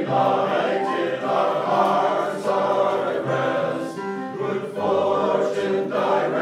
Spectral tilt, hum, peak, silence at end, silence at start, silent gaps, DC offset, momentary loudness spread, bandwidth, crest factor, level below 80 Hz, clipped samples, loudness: -6 dB/octave; none; -6 dBFS; 0 s; 0 s; none; under 0.1%; 7 LU; 13 kHz; 16 dB; -74 dBFS; under 0.1%; -22 LUFS